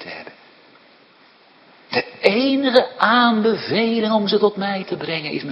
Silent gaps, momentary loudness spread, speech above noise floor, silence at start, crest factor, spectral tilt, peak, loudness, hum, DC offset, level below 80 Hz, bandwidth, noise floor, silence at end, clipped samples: none; 10 LU; 33 dB; 0 s; 20 dB; -6.5 dB/octave; 0 dBFS; -18 LUFS; none; under 0.1%; -66 dBFS; 7.8 kHz; -51 dBFS; 0 s; under 0.1%